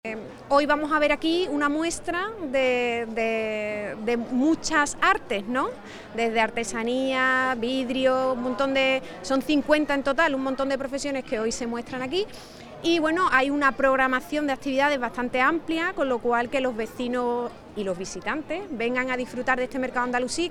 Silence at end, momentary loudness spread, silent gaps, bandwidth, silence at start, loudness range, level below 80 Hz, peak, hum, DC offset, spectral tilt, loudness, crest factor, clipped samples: 0 s; 9 LU; none; 15.5 kHz; 0.05 s; 4 LU; -52 dBFS; -6 dBFS; none; under 0.1%; -3.5 dB/octave; -25 LUFS; 20 dB; under 0.1%